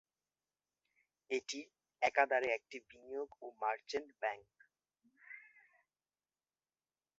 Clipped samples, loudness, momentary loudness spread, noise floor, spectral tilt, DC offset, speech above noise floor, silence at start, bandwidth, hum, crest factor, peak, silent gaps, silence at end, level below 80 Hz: under 0.1%; -39 LUFS; 21 LU; under -90 dBFS; 0.5 dB/octave; under 0.1%; over 51 dB; 1.3 s; 7.6 kHz; none; 26 dB; -16 dBFS; none; 1.8 s; -84 dBFS